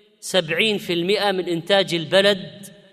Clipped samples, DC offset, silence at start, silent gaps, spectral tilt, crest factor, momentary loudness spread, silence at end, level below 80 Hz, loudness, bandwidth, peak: under 0.1%; under 0.1%; 0.25 s; none; -4 dB/octave; 18 dB; 7 LU; 0.25 s; -66 dBFS; -20 LUFS; 15.5 kHz; -4 dBFS